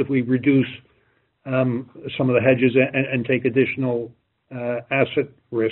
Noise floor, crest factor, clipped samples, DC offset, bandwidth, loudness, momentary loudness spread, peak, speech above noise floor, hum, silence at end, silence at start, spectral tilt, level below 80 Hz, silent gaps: -64 dBFS; 18 dB; under 0.1%; under 0.1%; 4.1 kHz; -21 LUFS; 13 LU; -4 dBFS; 43 dB; none; 0 s; 0 s; -6 dB/octave; -62 dBFS; none